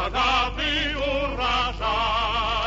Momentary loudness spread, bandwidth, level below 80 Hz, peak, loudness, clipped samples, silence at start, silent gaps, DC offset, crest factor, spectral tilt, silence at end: 3 LU; 8 kHz; -34 dBFS; -10 dBFS; -23 LUFS; under 0.1%; 0 s; none; under 0.1%; 14 dB; -4 dB/octave; 0 s